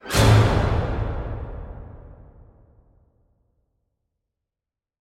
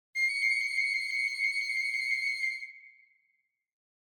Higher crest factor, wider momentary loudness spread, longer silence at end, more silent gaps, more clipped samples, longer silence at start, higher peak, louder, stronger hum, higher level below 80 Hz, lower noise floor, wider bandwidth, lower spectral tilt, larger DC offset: first, 20 dB vs 14 dB; first, 24 LU vs 6 LU; first, 2.85 s vs 1.15 s; neither; neither; about the same, 0.05 s vs 0.15 s; first, -4 dBFS vs -18 dBFS; first, -21 LUFS vs -29 LUFS; neither; first, -32 dBFS vs under -90 dBFS; first, -89 dBFS vs -77 dBFS; second, 15.5 kHz vs 19 kHz; first, -5.5 dB/octave vs 7 dB/octave; neither